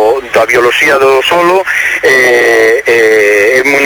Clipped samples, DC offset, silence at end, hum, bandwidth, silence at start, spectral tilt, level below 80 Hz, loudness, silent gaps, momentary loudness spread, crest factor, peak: under 0.1%; under 0.1%; 0 s; none; 17.5 kHz; 0 s; -2.5 dB/octave; -44 dBFS; -7 LUFS; none; 3 LU; 6 dB; 0 dBFS